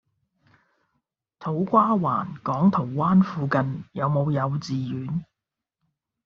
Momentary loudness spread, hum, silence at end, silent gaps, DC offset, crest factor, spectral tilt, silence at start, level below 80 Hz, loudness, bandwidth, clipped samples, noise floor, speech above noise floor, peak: 10 LU; none; 1 s; none; under 0.1%; 20 dB; -8 dB/octave; 1.4 s; -60 dBFS; -24 LUFS; 6.8 kHz; under 0.1%; -86 dBFS; 63 dB; -6 dBFS